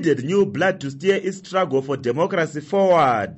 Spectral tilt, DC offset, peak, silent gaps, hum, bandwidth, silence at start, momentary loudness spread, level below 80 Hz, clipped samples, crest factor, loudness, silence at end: -6 dB/octave; under 0.1%; -6 dBFS; none; none; 8.2 kHz; 0 s; 7 LU; -62 dBFS; under 0.1%; 14 dB; -20 LUFS; 0 s